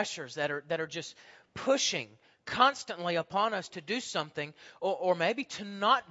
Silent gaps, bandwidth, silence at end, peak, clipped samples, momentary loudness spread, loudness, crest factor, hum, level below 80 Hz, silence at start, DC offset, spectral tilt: none; 8 kHz; 0.1 s; -8 dBFS; under 0.1%; 14 LU; -31 LUFS; 24 dB; none; -74 dBFS; 0 s; under 0.1%; -3 dB/octave